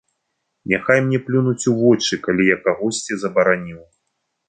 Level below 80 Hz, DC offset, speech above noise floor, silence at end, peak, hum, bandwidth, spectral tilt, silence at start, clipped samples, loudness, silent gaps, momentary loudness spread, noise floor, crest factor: -58 dBFS; under 0.1%; 56 dB; 0.65 s; 0 dBFS; none; 9.4 kHz; -5 dB/octave; 0.65 s; under 0.1%; -18 LUFS; none; 7 LU; -74 dBFS; 18 dB